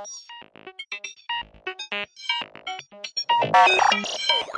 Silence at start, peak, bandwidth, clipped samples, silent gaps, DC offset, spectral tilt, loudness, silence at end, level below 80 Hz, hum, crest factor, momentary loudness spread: 0 s; -6 dBFS; 10.5 kHz; under 0.1%; none; under 0.1%; -1.5 dB/octave; -22 LUFS; 0 s; -66 dBFS; none; 20 dB; 22 LU